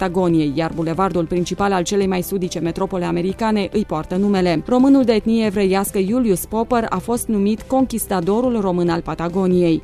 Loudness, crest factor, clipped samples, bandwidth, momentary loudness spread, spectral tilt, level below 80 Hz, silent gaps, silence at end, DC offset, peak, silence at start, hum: -18 LUFS; 14 dB; under 0.1%; 14 kHz; 6 LU; -6 dB/octave; -40 dBFS; none; 0 s; under 0.1%; -2 dBFS; 0 s; none